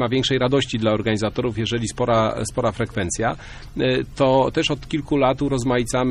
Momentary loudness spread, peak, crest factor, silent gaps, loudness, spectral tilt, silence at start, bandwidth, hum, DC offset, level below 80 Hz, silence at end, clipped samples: 5 LU; -6 dBFS; 16 dB; none; -21 LUFS; -5 dB/octave; 0 s; 12.5 kHz; none; under 0.1%; -40 dBFS; 0 s; under 0.1%